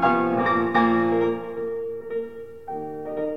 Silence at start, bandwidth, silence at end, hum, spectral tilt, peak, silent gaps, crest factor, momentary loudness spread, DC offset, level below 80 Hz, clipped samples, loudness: 0 s; 6 kHz; 0 s; none; -8 dB/octave; -8 dBFS; none; 16 dB; 14 LU; 0.4%; -58 dBFS; under 0.1%; -24 LUFS